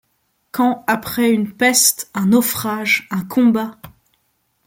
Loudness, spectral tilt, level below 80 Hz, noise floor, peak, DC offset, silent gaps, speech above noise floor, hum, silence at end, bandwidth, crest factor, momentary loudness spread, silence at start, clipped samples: -16 LUFS; -3 dB/octave; -58 dBFS; -66 dBFS; 0 dBFS; under 0.1%; none; 49 dB; none; 0.75 s; 17 kHz; 18 dB; 8 LU; 0.55 s; under 0.1%